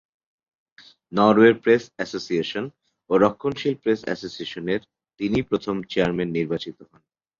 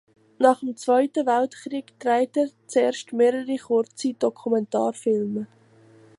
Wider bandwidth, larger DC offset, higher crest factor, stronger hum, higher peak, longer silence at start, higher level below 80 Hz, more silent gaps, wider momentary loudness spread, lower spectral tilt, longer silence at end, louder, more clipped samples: second, 7.4 kHz vs 11.5 kHz; neither; about the same, 20 dB vs 20 dB; neither; about the same, -2 dBFS vs -4 dBFS; first, 1.1 s vs 0.4 s; first, -56 dBFS vs -76 dBFS; neither; first, 14 LU vs 8 LU; first, -6.5 dB/octave vs -5 dB/octave; second, 0.55 s vs 0.75 s; about the same, -23 LUFS vs -24 LUFS; neither